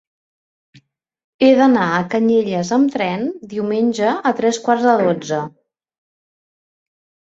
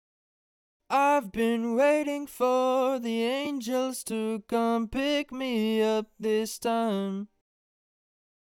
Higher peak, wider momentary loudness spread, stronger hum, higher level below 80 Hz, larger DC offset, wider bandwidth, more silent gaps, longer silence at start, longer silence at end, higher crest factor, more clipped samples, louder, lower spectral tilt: first, -2 dBFS vs -12 dBFS; first, 11 LU vs 7 LU; neither; about the same, -62 dBFS vs -60 dBFS; neither; second, 8 kHz vs 17.5 kHz; neither; first, 1.4 s vs 0.9 s; first, 1.75 s vs 1.25 s; about the same, 16 dB vs 16 dB; neither; first, -17 LUFS vs -27 LUFS; about the same, -5.5 dB/octave vs -4.5 dB/octave